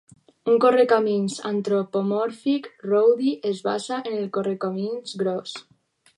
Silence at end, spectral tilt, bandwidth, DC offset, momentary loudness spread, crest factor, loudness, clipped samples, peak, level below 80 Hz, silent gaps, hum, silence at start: 0.55 s; -6 dB/octave; 11.5 kHz; under 0.1%; 10 LU; 18 dB; -23 LUFS; under 0.1%; -4 dBFS; -76 dBFS; none; none; 0.45 s